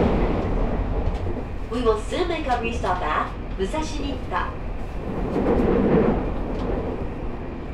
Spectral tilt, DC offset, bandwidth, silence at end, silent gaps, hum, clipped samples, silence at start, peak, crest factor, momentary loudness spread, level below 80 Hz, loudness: -7 dB/octave; under 0.1%; 11 kHz; 0 s; none; none; under 0.1%; 0 s; -6 dBFS; 16 dB; 11 LU; -30 dBFS; -25 LUFS